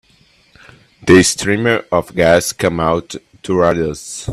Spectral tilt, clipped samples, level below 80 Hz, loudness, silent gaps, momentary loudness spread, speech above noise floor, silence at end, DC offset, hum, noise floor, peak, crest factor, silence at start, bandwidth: -4.5 dB/octave; under 0.1%; -42 dBFS; -14 LUFS; none; 14 LU; 38 dB; 0 s; under 0.1%; none; -52 dBFS; 0 dBFS; 16 dB; 1.05 s; 14.5 kHz